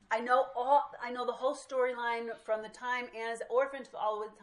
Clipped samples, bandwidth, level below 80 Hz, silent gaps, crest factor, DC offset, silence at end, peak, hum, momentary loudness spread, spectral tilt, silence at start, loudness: under 0.1%; 11 kHz; -76 dBFS; none; 18 dB; under 0.1%; 0.1 s; -16 dBFS; none; 8 LU; -2.5 dB/octave; 0.1 s; -33 LUFS